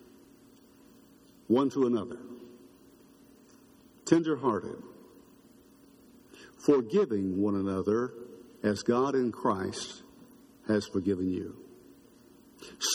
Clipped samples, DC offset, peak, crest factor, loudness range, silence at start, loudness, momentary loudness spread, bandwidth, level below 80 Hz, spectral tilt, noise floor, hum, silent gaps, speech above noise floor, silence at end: under 0.1%; under 0.1%; -8 dBFS; 24 dB; 5 LU; 1.5 s; -30 LUFS; 21 LU; 17.5 kHz; -70 dBFS; -5 dB/octave; -58 dBFS; none; none; 29 dB; 0 s